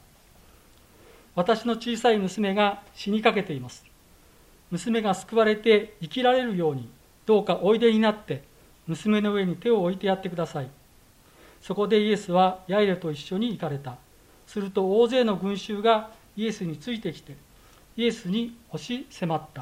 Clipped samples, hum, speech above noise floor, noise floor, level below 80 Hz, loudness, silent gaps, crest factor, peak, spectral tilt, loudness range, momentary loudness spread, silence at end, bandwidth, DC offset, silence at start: under 0.1%; none; 31 dB; -56 dBFS; -60 dBFS; -25 LUFS; none; 22 dB; -4 dBFS; -6 dB/octave; 4 LU; 14 LU; 0 s; 16 kHz; under 0.1%; 1.35 s